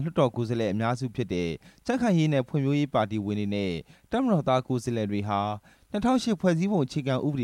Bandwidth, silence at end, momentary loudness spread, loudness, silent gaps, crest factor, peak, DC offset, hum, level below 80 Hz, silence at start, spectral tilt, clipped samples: 12.5 kHz; 0 s; 8 LU; -27 LUFS; none; 18 dB; -10 dBFS; under 0.1%; none; -56 dBFS; 0 s; -7 dB/octave; under 0.1%